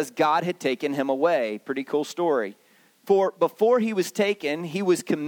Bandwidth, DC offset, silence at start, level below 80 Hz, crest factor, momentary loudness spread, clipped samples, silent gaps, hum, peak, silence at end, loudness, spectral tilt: 19 kHz; under 0.1%; 0 s; -78 dBFS; 16 dB; 7 LU; under 0.1%; none; none; -8 dBFS; 0 s; -24 LUFS; -5 dB/octave